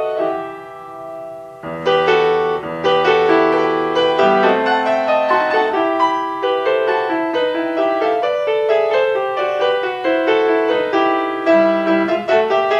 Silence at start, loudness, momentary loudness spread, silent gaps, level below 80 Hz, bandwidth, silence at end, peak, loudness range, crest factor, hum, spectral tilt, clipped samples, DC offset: 0 s; -16 LUFS; 9 LU; none; -58 dBFS; 8.8 kHz; 0 s; 0 dBFS; 2 LU; 16 dB; none; -5.5 dB/octave; under 0.1%; under 0.1%